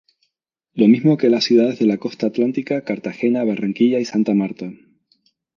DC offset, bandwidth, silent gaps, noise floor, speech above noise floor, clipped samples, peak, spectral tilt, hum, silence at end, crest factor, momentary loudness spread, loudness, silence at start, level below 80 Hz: under 0.1%; 7.2 kHz; none; -77 dBFS; 59 dB; under 0.1%; -2 dBFS; -7 dB/octave; none; 0.8 s; 16 dB; 11 LU; -18 LUFS; 0.75 s; -68 dBFS